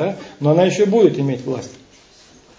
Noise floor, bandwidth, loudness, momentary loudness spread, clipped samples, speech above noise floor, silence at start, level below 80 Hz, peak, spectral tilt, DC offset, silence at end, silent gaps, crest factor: -48 dBFS; 7.8 kHz; -17 LUFS; 13 LU; under 0.1%; 31 dB; 0 s; -60 dBFS; -2 dBFS; -7 dB/octave; under 0.1%; 0.9 s; none; 16 dB